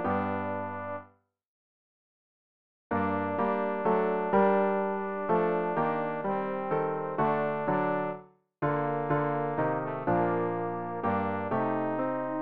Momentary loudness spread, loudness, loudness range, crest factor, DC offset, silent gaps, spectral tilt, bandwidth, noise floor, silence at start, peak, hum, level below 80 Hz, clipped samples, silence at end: 7 LU; -30 LUFS; 5 LU; 16 dB; 0.3%; 1.45-2.90 s; -6.5 dB/octave; 4.9 kHz; -60 dBFS; 0 s; -14 dBFS; none; -66 dBFS; under 0.1%; 0 s